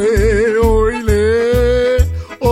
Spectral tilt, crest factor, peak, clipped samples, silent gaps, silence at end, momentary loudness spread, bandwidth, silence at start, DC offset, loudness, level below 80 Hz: -6.5 dB/octave; 12 dB; 0 dBFS; under 0.1%; none; 0 s; 4 LU; 16 kHz; 0 s; under 0.1%; -14 LUFS; -20 dBFS